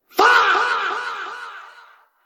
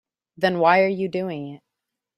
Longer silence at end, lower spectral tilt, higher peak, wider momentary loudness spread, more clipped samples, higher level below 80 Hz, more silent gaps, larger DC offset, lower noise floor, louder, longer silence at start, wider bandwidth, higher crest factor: about the same, 0.55 s vs 0.6 s; second, -0.5 dB/octave vs -7 dB/octave; about the same, -2 dBFS vs -4 dBFS; first, 21 LU vs 15 LU; neither; first, -64 dBFS vs -70 dBFS; neither; neither; second, -49 dBFS vs -83 dBFS; first, -17 LUFS vs -21 LUFS; second, 0.15 s vs 0.4 s; first, 16 kHz vs 12.5 kHz; about the same, 18 dB vs 20 dB